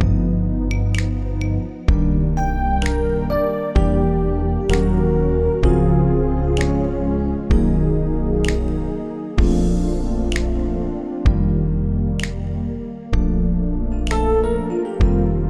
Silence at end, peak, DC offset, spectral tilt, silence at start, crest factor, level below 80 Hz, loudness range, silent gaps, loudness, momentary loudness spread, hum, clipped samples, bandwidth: 0 s; -4 dBFS; under 0.1%; -7.5 dB/octave; 0 s; 14 dB; -20 dBFS; 3 LU; none; -20 LUFS; 6 LU; none; under 0.1%; 11 kHz